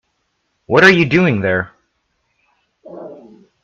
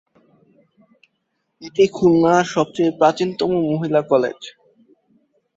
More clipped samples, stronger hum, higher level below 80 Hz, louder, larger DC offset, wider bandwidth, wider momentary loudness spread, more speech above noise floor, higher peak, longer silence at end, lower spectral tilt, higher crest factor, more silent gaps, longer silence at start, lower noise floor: neither; neither; first, -52 dBFS vs -58 dBFS; first, -12 LUFS vs -18 LUFS; neither; first, 10 kHz vs 7.8 kHz; first, 25 LU vs 13 LU; about the same, 56 dB vs 55 dB; about the same, 0 dBFS vs -2 dBFS; second, 0.5 s vs 1.05 s; about the same, -6 dB/octave vs -6 dB/octave; about the same, 18 dB vs 18 dB; neither; second, 0.7 s vs 1.6 s; second, -68 dBFS vs -72 dBFS